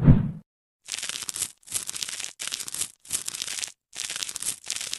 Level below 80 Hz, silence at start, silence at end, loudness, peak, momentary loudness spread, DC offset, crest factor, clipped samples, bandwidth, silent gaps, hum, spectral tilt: -36 dBFS; 0 s; 0 s; -29 LUFS; -4 dBFS; 5 LU; under 0.1%; 24 dB; under 0.1%; 13.5 kHz; 0.46-0.80 s; none; -3.5 dB/octave